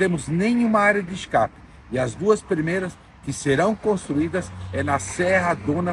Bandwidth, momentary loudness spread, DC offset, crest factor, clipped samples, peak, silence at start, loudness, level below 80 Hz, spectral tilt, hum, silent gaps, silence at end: 11 kHz; 9 LU; under 0.1%; 18 dB; under 0.1%; -4 dBFS; 0 s; -22 LUFS; -48 dBFS; -5.5 dB/octave; none; none; 0 s